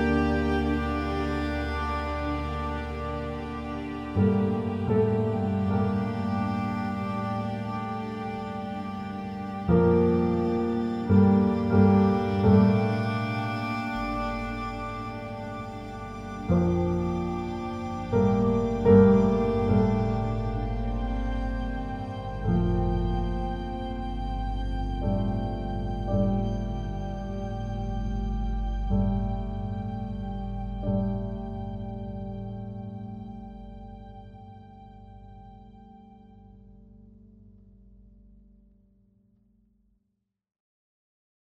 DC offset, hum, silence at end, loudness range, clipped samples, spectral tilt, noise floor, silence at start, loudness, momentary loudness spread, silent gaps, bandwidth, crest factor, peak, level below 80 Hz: under 0.1%; none; 4.3 s; 11 LU; under 0.1%; -9 dB/octave; -79 dBFS; 0 s; -27 LUFS; 15 LU; none; 7.4 kHz; 22 dB; -6 dBFS; -36 dBFS